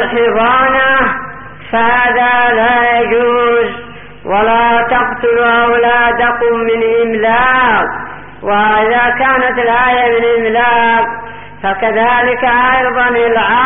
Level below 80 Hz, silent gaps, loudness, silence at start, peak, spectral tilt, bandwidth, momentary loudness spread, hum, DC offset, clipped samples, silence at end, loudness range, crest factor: -38 dBFS; none; -10 LUFS; 0 s; -2 dBFS; -1 dB/octave; 3.8 kHz; 9 LU; 50 Hz at -40 dBFS; 2%; under 0.1%; 0 s; 1 LU; 10 dB